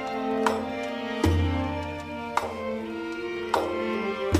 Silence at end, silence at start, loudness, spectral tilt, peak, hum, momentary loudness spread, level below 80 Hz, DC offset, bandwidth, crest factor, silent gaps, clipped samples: 0 s; 0 s; -29 LUFS; -6 dB/octave; -6 dBFS; none; 7 LU; -42 dBFS; under 0.1%; 15 kHz; 22 dB; none; under 0.1%